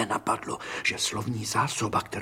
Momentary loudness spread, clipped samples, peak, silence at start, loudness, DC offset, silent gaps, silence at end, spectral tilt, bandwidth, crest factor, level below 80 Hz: 5 LU; under 0.1%; -10 dBFS; 0 s; -28 LUFS; under 0.1%; none; 0 s; -3 dB/octave; 16.5 kHz; 18 dB; -58 dBFS